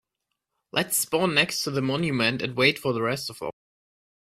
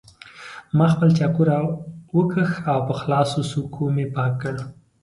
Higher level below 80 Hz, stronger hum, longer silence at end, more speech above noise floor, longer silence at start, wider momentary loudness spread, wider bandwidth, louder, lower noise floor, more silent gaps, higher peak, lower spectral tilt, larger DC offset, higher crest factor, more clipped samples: second, -62 dBFS vs -56 dBFS; neither; first, 0.85 s vs 0.3 s; first, 57 dB vs 22 dB; first, 0.75 s vs 0.25 s; second, 9 LU vs 15 LU; first, 16 kHz vs 11.5 kHz; second, -24 LUFS vs -21 LUFS; first, -82 dBFS vs -42 dBFS; neither; about the same, -6 dBFS vs -6 dBFS; second, -3.5 dB/octave vs -7.5 dB/octave; neither; about the same, 20 dB vs 16 dB; neither